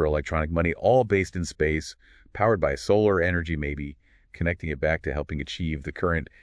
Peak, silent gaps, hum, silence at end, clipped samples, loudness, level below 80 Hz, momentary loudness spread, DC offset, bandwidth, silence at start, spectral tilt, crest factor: -6 dBFS; none; none; 0.2 s; under 0.1%; -25 LUFS; -38 dBFS; 10 LU; under 0.1%; 11 kHz; 0 s; -6.5 dB/octave; 18 dB